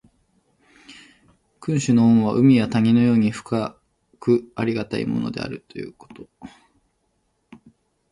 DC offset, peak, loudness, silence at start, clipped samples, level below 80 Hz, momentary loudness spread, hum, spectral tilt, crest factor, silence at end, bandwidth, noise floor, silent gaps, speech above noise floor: under 0.1%; -4 dBFS; -20 LUFS; 0.9 s; under 0.1%; -56 dBFS; 19 LU; none; -7 dB/octave; 18 dB; 1.65 s; 10.5 kHz; -69 dBFS; none; 50 dB